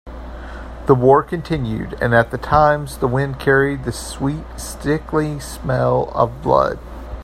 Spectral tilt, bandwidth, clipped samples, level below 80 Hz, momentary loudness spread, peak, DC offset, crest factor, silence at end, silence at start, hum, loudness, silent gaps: -6.5 dB/octave; 15.5 kHz; under 0.1%; -34 dBFS; 16 LU; 0 dBFS; under 0.1%; 18 dB; 0 s; 0.05 s; none; -18 LUFS; none